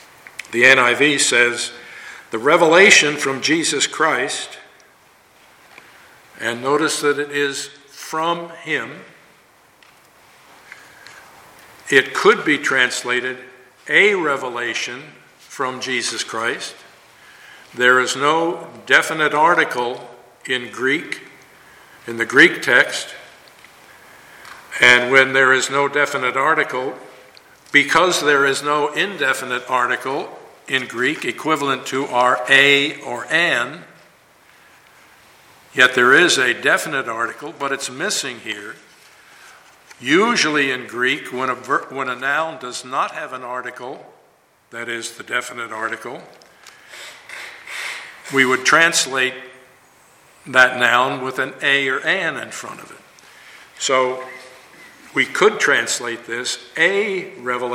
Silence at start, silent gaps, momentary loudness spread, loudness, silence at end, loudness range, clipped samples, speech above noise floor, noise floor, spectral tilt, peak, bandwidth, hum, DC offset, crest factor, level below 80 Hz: 0.5 s; none; 19 LU; -17 LUFS; 0 s; 10 LU; under 0.1%; 38 dB; -56 dBFS; -2 dB/octave; 0 dBFS; 16.5 kHz; none; under 0.1%; 20 dB; -66 dBFS